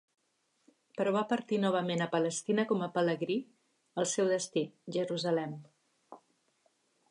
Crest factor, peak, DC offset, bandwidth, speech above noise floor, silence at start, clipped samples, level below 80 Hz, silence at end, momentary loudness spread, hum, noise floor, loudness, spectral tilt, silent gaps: 18 dB; -16 dBFS; under 0.1%; 11 kHz; 45 dB; 0.95 s; under 0.1%; -86 dBFS; 0.95 s; 7 LU; none; -76 dBFS; -32 LUFS; -4.5 dB/octave; none